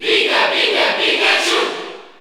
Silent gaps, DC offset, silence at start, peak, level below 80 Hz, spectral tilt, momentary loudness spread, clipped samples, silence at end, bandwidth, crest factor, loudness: none; under 0.1%; 0 s; -2 dBFS; -62 dBFS; -0.5 dB/octave; 11 LU; under 0.1%; 0.1 s; over 20 kHz; 14 dB; -14 LUFS